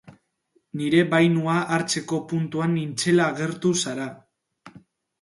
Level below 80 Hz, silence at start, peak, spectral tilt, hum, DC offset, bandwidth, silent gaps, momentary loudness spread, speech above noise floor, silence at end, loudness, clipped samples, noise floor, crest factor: -66 dBFS; 0.1 s; -4 dBFS; -5 dB/octave; none; under 0.1%; 11.5 kHz; none; 10 LU; 46 dB; 0.45 s; -23 LUFS; under 0.1%; -68 dBFS; 20 dB